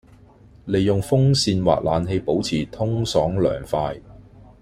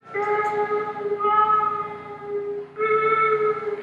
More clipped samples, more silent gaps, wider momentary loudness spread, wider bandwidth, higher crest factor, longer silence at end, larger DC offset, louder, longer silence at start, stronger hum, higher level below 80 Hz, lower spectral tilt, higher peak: neither; neither; second, 7 LU vs 12 LU; first, 15 kHz vs 7.6 kHz; about the same, 18 dB vs 14 dB; first, 0.45 s vs 0 s; neither; about the same, -21 LUFS vs -22 LUFS; first, 0.65 s vs 0.05 s; neither; first, -44 dBFS vs -72 dBFS; about the same, -6 dB/octave vs -6 dB/octave; first, -2 dBFS vs -8 dBFS